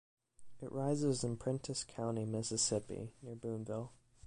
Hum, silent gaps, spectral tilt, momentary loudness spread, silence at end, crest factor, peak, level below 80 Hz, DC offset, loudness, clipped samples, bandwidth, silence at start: none; none; -5 dB/octave; 13 LU; 0 s; 18 dB; -22 dBFS; -66 dBFS; under 0.1%; -39 LUFS; under 0.1%; 11.5 kHz; 0.4 s